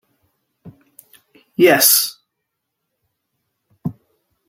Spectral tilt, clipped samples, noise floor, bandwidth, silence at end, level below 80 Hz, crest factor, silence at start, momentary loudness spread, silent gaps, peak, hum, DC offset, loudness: -2.5 dB/octave; under 0.1%; -77 dBFS; 16.5 kHz; 0.55 s; -64 dBFS; 22 dB; 0.65 s; 20 LU; none; 0 dBFS; none; under 0.1%; -13 LUFS